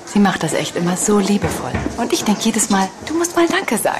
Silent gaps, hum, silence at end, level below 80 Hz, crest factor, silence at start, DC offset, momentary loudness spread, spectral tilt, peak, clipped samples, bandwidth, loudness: none; none; 0 s; -42 dBFS; 12 dB; 0 s; under 0.1%; 6 LU; -4 dB/octave; -6 dBFS; under 0.1%; 14 kHz; -17 LUFS